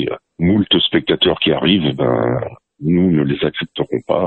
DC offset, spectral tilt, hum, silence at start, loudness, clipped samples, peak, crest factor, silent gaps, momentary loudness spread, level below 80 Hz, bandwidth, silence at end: under 0.1%; -9 dB/octave; none; 0 s; -16 LUFS; under 0.1%; -2 dBFS; 14 dB; none; 9 LU; -44 dBFS; 4.3 kHz; 0 s